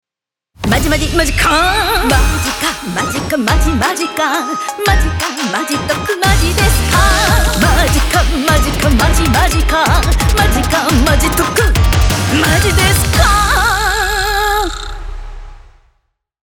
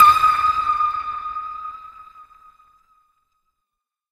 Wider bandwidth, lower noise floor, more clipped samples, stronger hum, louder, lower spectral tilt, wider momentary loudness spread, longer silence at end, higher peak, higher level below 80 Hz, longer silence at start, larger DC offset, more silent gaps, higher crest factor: first, over 20 kHz vs 15.5 kHz; about the same, -86 dBFS vs -83 dBFS; neither; neither; first, -12 LUFS vs -19 LUFS; first, -4 dB/octave vs -1.5 dB/octave; second, 6 LU vs 20 LU; second, 1 s vs 1.9 s; about the same, 0 dBFS vs 0 dBFS; first, -18 dBFS vs -54 dBFS; first, 0.6 s vs 0 s; neither; neither; second, 12 dB vs 20 dB